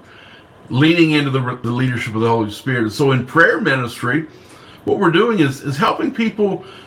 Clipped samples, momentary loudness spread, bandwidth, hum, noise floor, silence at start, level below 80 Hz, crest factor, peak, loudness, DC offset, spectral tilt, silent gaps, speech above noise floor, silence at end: under 0.1%; 8 LU; 16 kHz; none; -42 dBFS; 0.7 s; -56 dBFS; 18 dB; 0 dBFS; -16 LUFS; under 0.1%; -6.5 dB/octave; none; 26 dB; 0 s